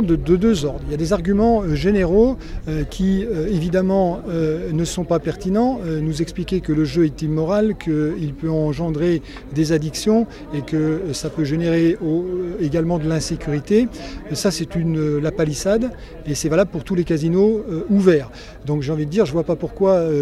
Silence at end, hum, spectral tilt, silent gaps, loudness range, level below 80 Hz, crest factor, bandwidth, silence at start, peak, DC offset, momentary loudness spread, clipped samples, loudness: 0 s; none; -6.5 dB/octave; none; 2 LU; -34 dBFS; 18 dB; 14.5 kHz; 0 s; -2 dBFS; under 0.1%; 8 LU; under 0.1%; -20 LUFS